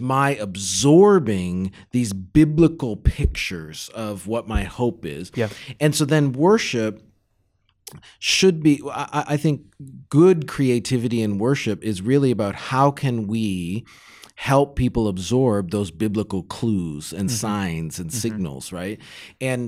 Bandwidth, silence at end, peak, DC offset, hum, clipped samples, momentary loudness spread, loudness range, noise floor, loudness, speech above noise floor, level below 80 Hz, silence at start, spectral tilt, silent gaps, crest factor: 16 kHz; 0 s; -4 dBFS; under 0.1%; none; under 0.1%; 13 LU; 6 LU; -66 dBFS; -21 LUFS; 46 dB; -36 dBFS; 0 s; -5.5 dB/octave; none; 16 dB